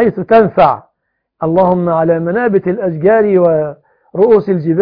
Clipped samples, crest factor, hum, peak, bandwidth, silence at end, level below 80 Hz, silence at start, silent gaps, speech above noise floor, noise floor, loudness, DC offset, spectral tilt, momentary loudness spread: 0.1%; 12 dB; none; 0 dBFS; 5.2 kHz; 0 s; -48 dBFS; 0 s; none; 59 dB; -70 dBFS; -12 LUFS; under 0.1%; -11 dB/octave; 7 LU